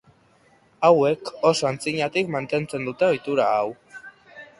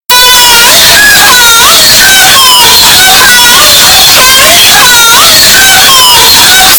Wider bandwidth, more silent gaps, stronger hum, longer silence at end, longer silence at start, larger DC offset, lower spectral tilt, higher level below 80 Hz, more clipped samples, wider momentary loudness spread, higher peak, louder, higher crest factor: second, 11.5 kHz vs over 20 kHz; neither; neither; first, 0.15 s vs 0 s; first, 0.8 s vs 0.1 s; neither; first, -5 dB/octave vs 1 dB/octave; second, -64 dBFS vs -28 dBFS; second, under 0.1% vs 40%; first, 12 LU vs 0 LU; second, -4 dBFS vs 0 dBFS; second, -22 LUFS vs 2 LUFS; first, 20 dB vs 2 dB